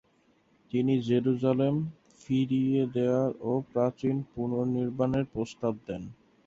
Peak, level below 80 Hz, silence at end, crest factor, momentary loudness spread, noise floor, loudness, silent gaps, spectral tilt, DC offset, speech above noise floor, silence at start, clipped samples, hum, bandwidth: -12 dBFS; -62 dBFS; 0.35 s; 16 dB; 8 LU; -66 dBFS; -29 LUFS; none; -8.5 dB/octave; under 0.1%; 39 dB; 0.75 s; under 0.1%; none; 7.6 kHz